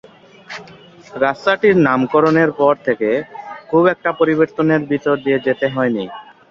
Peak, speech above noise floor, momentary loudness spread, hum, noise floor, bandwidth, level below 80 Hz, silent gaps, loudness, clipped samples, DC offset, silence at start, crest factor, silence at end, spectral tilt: -2 dBFS; 24 dB; 19 LU; none; -39 dBFS; 7.2 kHz; -56 dBFS; none; -16 LUFS; under 0.1%; under 0.1%; 0.5 s; 16 dB; 0.3 s; -7.5 dB/octave